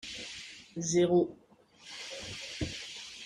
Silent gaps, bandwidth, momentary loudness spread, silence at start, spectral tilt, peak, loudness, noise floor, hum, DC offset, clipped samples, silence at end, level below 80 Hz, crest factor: none; 11 kHz; 17 LU; 0 s; -4.5 dB/octave; -16 dBFS; -33 LUFS; -56 dBFS; none; under 0.1%; under 0.1%; 0 s; -60 dBFS; 18 dB